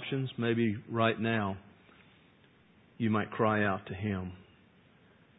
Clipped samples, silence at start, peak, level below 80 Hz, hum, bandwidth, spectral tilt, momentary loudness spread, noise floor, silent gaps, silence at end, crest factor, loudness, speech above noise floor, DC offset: under 0.1%; 0 s; -12 dBFS; -60 dBFS; none; 3.9 kHz; -4 dB/octave; 9 LU; -63 dBFS; none; 0.95 s; 22 dB; -32 LUFS; 31 dB; under 0.1%